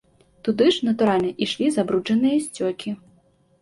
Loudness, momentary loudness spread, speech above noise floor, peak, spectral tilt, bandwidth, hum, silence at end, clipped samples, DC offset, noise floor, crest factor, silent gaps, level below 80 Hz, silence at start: -22 LUFS; 11 LU; 38 dB; -6 dBFS; -5 dB/octave; 11.5 kHz; none; 0.65 s; under 0.1%; under 0.1%; -59 dBFS; 16 dB; none; -62 dBFS; 0.45 s